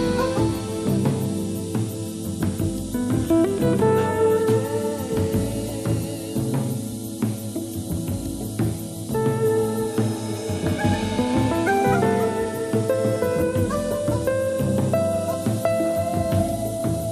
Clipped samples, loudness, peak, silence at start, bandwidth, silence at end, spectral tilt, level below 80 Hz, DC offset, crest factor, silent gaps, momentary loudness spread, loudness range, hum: under 0.1%; -23 LUFS; -6 dBFS; 0 s; 15.5 kHz; 0 s; -6.5 dB/octave; -44 dBFS; under 0.1%; 16 dB; none; 8 LU; 4 LU; none